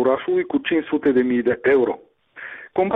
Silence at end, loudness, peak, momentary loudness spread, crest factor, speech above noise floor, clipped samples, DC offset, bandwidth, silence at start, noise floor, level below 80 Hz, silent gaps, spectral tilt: 0 s; -20 LUFS; -8 dBFS; 17 LU; 12 dB; 20 dB; under 0.1%; under 0.1%; 3.9 kHz; 0 s; -39 dBFS; -60 dBFS; none; -8.5 dB/octave